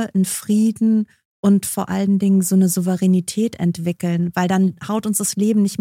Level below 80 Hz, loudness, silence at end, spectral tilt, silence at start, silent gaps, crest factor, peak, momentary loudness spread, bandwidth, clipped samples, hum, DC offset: -60 dBFS; -18 LUFS; 0.05 s; -6 dB/octave; 0 s; 1.25-1.43 s; 14 dB; -4 dBFS; 6 LU; 16 kHz; under 0.1%; none; under 0.1%